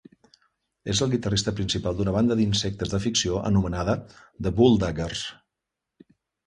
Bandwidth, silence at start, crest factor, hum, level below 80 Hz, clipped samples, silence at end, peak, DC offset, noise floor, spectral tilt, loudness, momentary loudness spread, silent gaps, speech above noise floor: 11.5 kHz; 0.85 s; 20 dB; none; -42 dBFS; under 0.1%; 1.15 s; -6 dBFS; under 0.1%; -85 dBFS; -5 dB/octave; -24 LUFS; 10 LU; none; 61 dB